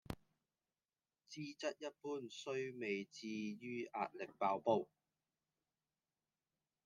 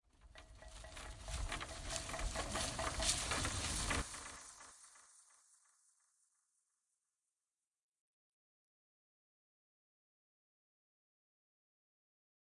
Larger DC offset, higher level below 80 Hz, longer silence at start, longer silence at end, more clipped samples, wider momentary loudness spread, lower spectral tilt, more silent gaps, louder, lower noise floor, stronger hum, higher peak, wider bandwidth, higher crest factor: neither; second, -76 dBFS vs -54 dBFS; about the same, 0.1 s vs 0.2 s; second, 2 s vs 7.35 s; neither; second, 12 LU vs 23 LU; first, -5 dB/octave vs -2 dB/octave; neither; second, -44 LUFS vs -41 LUFS; about the same, under -90 dBFS vs under -90 dBFS; neither; second, -22 dBFS vs -18 dBFS; first, 13.5 kHz vs 11.5 kHz; about the same, 24 dB vs 28 dB